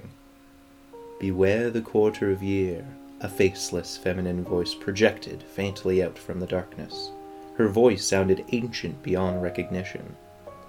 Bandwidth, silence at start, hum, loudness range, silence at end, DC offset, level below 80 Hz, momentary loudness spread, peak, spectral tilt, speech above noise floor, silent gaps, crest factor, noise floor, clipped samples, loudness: 16.5 kHz; 0 s; none; 2 LU; 0 s; under 0.1%; -58 dBFS; 15 LU; -4 dBFS; -5.5 dB/octave; 27 dB; none; 22 dB; -52 dBFS; under 0.1%; -26 LUFS